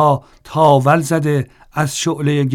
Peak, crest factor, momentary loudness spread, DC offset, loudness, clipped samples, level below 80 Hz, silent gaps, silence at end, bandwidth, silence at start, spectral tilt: 0 dBFS; 14 dB; 10 LU; under 0.1%; -16 LUFS; under 0.1%; -50 dBFS; none; 0 s; 15 kHz; 0 s; -6 dB/octave